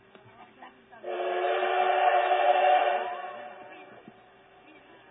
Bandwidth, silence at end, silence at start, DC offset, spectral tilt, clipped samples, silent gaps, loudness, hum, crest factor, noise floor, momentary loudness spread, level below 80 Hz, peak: 4 kHz; 1.15 s; 0.4 s; under 0.1%; -6.5 dB/octave; under 0.1%; none; -26 LUFS; none; 18 dB; -56 dBFS; 22 LU; -82 dBFS; -10 dBFS